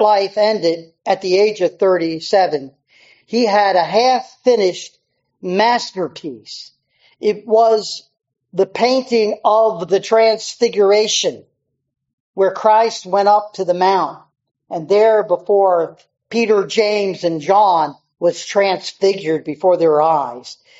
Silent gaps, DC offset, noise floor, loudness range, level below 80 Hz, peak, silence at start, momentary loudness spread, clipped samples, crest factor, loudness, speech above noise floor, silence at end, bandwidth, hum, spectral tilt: 12.13-12.34 s; under 0.1%; -51 dBFS; 3 LU; -70 dBFS; 0 dBFS; 0 s; 12 LU; under 0.1%; 16 dB; -16 LUFS; 36 dB; 0.25 s; 8 kHz; none; -2.5 dB/octave